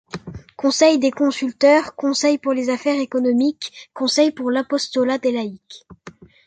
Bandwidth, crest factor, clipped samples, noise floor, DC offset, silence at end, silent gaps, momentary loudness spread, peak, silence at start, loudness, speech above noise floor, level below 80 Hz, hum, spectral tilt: 9.4 kHz; 18 dB; under 0.1%; -43 dBFS; under 0.1%; 0.35 s; none; 16 LU; -2 dBFS; 0.15 s; -19 LUFS; 25 dB; -58 dBFS; none; -3.5 dB/octave